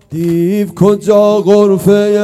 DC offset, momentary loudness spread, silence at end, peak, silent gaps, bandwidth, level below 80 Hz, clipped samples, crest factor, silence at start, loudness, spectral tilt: under 0.1%; 5 LU; 0 s; 0 dBFS; none; 14 kHz; -48 dBFS; 1%; 10 dB; 0.1 s; -10 LUFS; -7.5 dB/octave